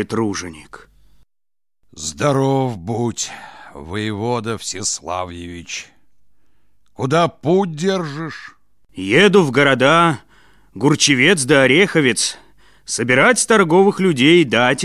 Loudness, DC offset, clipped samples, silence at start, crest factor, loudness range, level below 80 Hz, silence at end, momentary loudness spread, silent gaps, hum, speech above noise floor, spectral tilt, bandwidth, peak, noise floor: -15 LUFS; 0.3%; under 0.1%; 0 s; 16 dB; 10 LU; -50 dBFS; 0 s; 17 LU; none; none; over 74 dB; -4 dB/octave; 14.5 kHz; 0 dBFS; under -90 dBFS